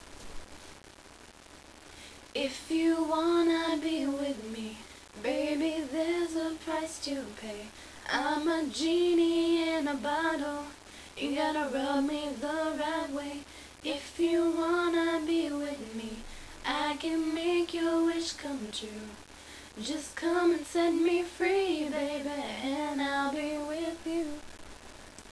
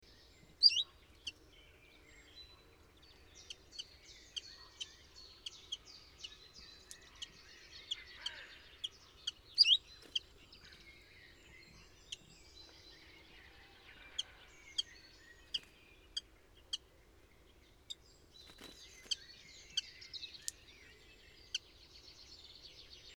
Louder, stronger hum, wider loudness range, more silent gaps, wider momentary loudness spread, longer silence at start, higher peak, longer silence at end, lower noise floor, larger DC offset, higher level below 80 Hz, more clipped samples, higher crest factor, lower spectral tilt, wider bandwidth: first, -31 LUFS vs -38 LUFS; neither; second, 4 LU vs 16 LU; neither; about the same, 20 LU vs 19 LU; second, 0 s vs 0.6 s; about the same, -16 dBFS vs -14 dBFS; about the same, 0 s vs 0.05 s; second, -53 dBFS vs -64 dBFS; neither; first, -58 dBFS vs -68 dBFS; neither; second, 16 dB vs 32 dB; first, -3.5 dB/octave vs 0.5 dB/octave; second, 11 kHz vs over 20 kHz